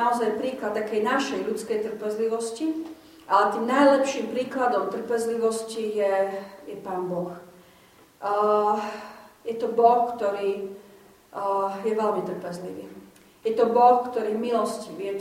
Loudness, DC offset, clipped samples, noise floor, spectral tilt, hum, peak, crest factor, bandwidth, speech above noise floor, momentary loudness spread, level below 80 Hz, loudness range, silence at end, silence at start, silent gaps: -25 LUFS; under 0.1%; under 0.1%; -55 dBFS; -4.5 dB/octave; none; -6 dBFS; 20 dB; 16 kHz; 30 dB; 17 LU; -70 dBFS; 5 LU; 0 s; 0 s; none